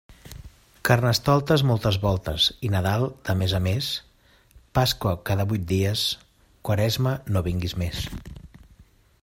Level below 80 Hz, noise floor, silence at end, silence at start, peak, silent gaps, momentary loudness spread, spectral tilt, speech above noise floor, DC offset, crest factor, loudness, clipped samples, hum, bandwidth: -44 dBFS; -56 dBFS; 0.4 s; 0.1 s; -2 dBFS; none; 14 LU; -5.5 dB/octave; 33 dB; under 0.1%; 22 dB; -24 LUFS; under 0.1%; none; 16.5 kHz